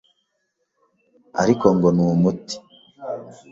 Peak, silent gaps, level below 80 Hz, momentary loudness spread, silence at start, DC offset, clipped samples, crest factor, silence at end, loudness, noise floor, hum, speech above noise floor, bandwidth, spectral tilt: -2 dBFS; none; -54 dBFS; 17 LU; 1.35 s; under 0.1%; under 0.1%; 20 dB; 0.2 s; -19 LUFS; -73 dBFS; none; 55 dB; 7.8 kHz; -7 dB/octave